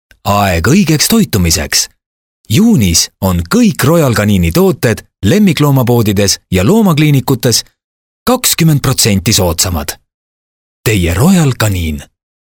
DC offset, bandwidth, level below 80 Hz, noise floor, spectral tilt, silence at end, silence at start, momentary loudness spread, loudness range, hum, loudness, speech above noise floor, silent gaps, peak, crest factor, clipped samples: under 0.1%; over 20 kHz; -30 dBFS; under -90 dBFS; -4.5 dB/octave; 0.5 s; 0.25 s; 6 LU; 2 LU; none; -10 LUFS; over 80 dB; 2.06-2.44 s, 7.84-8.26 s, 10.14-10.84 s; 0 dBFS; 10 dB; under 0.1%